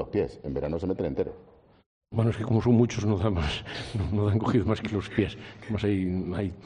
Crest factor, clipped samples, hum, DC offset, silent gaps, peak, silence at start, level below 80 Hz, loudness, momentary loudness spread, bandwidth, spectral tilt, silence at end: 18 dB; under 0.1%; none; under 0.1%; 1.86-2.01 s; -10 dBFS; 0 s; -46 dBFS; -28 LUFS; 10 LU; 9.8 kHz; -7.5 dB/octave; 0 s